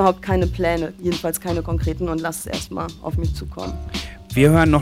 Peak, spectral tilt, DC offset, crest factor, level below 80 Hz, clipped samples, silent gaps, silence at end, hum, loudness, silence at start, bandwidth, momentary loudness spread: -2 dBFS; -6 dB/octave; under 0.1%; 18 dB; -30 dBFS; under 0.1%; none; 0 s; none; -22 LUFS; 0 s; 16.5 kHz; 13 LU